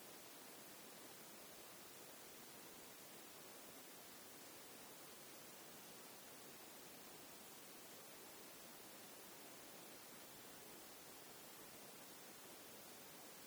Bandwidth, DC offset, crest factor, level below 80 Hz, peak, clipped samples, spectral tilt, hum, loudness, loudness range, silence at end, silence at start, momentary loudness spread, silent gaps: over 20 kHz; under 0.1%; 14 dB; under -90 dBFS; -44 dBFS; under 0.1%; -1.5 dB/octave; none; -57 LUFS; 0 LU; 0 s; 0 s; 0 LU; none